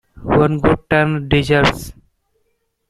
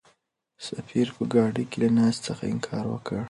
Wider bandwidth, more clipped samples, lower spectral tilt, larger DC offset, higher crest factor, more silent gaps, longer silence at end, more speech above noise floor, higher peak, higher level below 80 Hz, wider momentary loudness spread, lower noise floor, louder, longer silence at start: first, 13.5 kHz vs 11.5 kHz; neither; about the same, -6.5 dB/octave vs -6.5 dB/octave; neither; about the same, 16 dB vs 18 dB; neither; first, 1 s vs 0 s; first, 52 dB vs 44 dB; first, 0 dBFS vs -8 dBFS; first, -34 dBFS vs -60 dBFS; second, 7 LU vs 12 LU; about the same, -67 dBFS vs -70 dBFS; first, -15 LUFS vs -26 LUFS; second, 0.15 s vs 0.6 s